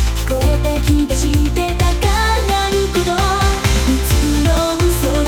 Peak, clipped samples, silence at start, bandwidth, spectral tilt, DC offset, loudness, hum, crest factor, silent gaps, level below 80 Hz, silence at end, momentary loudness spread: -2 dBFS; under 0.1%; 0 s; 18.5 kHz; -5 dB/octave; under 0.1%; -16 LUFS; none; 12 dB; none; -18 dBFS; 0 s; 2 LU